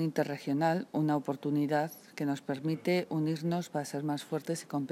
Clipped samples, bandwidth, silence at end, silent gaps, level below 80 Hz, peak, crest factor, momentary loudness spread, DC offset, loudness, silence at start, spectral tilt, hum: under 0.1%; 15.5 kHz; 0 s; none; -84 dBFS; -16 dBFS; 16 dB; 6 LU; under 0.1%; -33 LUFS; 0 s; -6.5 dB/octave; none